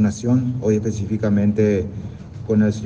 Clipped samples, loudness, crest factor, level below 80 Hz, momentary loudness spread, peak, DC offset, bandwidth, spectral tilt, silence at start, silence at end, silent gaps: under 0.1%; -20 LUFS; 14 dB; -48 dBFS; 14 LU; -6 dBFS; under 0.1%; 8.2 kHz; -8 dB/octave; 0 s; 0 s; none